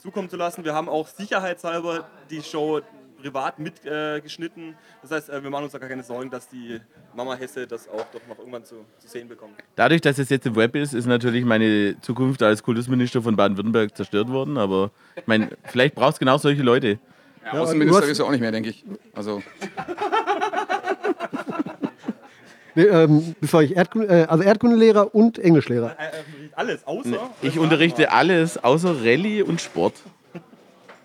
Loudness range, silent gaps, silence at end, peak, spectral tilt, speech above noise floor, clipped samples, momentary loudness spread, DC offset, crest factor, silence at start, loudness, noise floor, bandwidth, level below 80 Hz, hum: 14 LU; none; 0.1 s; -2 dBFS; -6 dB/octave; 30 dB; under 0.1%; 18 LU; under 0.1%; 20 dB; 0.05 s; -21 LUFS; -51 dBFS; 15.5 kHz; -72 dBFS; none